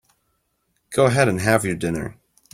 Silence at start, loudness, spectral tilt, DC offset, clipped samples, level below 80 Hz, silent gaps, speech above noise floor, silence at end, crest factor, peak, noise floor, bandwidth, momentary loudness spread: 0.9 s; -20 LUFS; -5.5 dB/octave; under 0.1%; under 0.1%; -50 dBFS; none; 51 dB; 0.4 s; 20 dB; -2 dBFS; -70 dBFS; 16 kHz; 11 LU